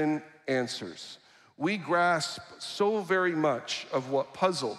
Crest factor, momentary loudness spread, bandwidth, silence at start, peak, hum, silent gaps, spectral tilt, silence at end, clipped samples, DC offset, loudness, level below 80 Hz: 18 dB; 13 LU; 13.5 kHz; 0 s; -12 dBFS; none; none; -4.5 dB/octave; 0 s; under 0.1%; under 0.1%; -29 LUFS; -78 dBFS